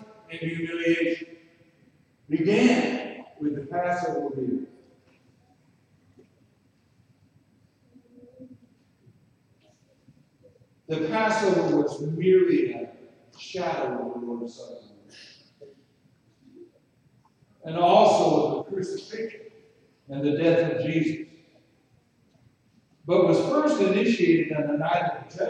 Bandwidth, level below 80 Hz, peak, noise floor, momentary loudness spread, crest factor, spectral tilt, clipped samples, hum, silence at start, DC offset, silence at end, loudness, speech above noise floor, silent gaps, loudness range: 9.6 kHz; -72 dBFS; -6 dBFS; -64 dBFS; 18 LU; 20 dB; -6 dB/octave; under 0.1%; none; 0 s; under 0.1%; 0 s; -24 LUFS; 40 dB; none; 11 LU